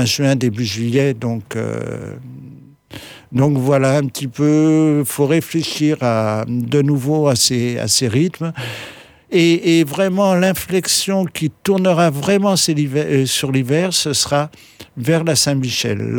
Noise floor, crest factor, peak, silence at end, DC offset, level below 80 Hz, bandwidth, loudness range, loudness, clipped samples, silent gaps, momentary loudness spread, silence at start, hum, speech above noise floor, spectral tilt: -40 dBFS; 14 dB; -4 dBFS; 0 s; under 0.1%; -54 dBFS; over 20 kHz; 4 LU; -16 LUFS; under 0.1%; none; 11 LU; 0 s; none; 23 dB; -4.5 dB/octave